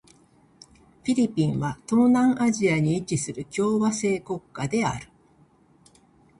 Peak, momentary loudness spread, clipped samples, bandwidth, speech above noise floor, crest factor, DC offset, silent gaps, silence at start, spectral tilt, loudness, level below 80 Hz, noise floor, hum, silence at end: -10 dBFS; 10 LU; under 0.1%; 11.5 kHz; 35 dB; 16 dB; under 0.1%; none; 1.05 s; -6 dB/octave; -24 LUFS; -58 dBFS; -59 dBFS; none; 1.35 s